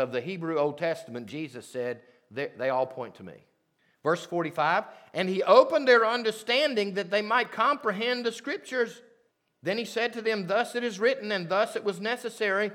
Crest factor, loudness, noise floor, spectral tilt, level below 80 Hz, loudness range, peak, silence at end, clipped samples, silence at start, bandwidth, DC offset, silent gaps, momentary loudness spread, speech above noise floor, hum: 22 dB; -27 LUFS; -71 dBFS; -4.5 dB/octave; -86 dBFS; 9 LU; -4 dBFS; 0 s; under 0.1%; 0 s; 15.5 kHz; under 0.1%; none; 15 LU; 43 dB; none